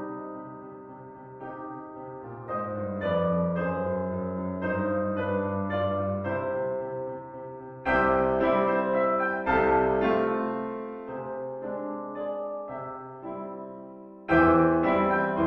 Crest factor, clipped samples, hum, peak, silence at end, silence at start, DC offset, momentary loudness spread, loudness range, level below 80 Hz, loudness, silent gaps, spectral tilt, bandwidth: 20 dB; under 0.1%; none; -8 dBFS; 0 s; 0 s; under 0.1%; 18 LU; 9 LU; -50 dBFS; -27 LUFS; none; -9.5 dB/octave; 5.8 kHz